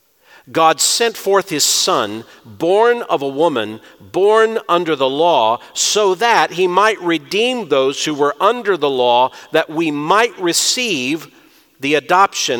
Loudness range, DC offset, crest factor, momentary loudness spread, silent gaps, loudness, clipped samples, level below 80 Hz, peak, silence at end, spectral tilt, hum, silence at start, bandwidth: 2 LU; under 0.1%; 16 dB; 7 LU; none; -15 LUFS; under 0.1%; -68 dBFS; 0 dBFS; 0 s; -2 dB/octave; none; 0.5 s; 19 kHz